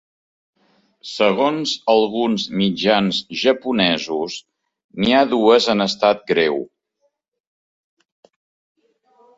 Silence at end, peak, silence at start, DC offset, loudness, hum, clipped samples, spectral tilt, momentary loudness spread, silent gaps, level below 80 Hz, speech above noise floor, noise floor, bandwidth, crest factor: 2.7 s; -2 dBFS; 1.05 s; under 0.1%; -18 LUFS; none; under 0.1%; -5 dB/octave; 13 LU; 4.84-4.89 s; -58 dBFS; 52 dB; -69 dBFS; 7.8 kHz; 18 dB